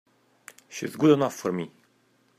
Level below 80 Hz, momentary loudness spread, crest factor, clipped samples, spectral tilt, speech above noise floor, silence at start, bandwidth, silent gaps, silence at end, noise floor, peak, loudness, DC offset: -72 dBFS; 18 LU; 22 dB; under 0.1%; -6 dB/octave; 41 dB; 0.7 s; 15.5 kHz; none; 0.7 s; -65 dBFS; -6 dBFS; -25 LUFS; under 0.1%